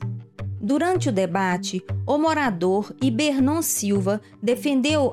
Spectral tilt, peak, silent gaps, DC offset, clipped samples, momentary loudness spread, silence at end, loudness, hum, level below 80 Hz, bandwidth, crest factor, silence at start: -5 dB/octave; -6 dBFS; none; under 0.1%; under 0.1%; 8 LU; 0 s; -22 LUFS; none; -58 dBFS; 16 kHz; 16 dB; 0 s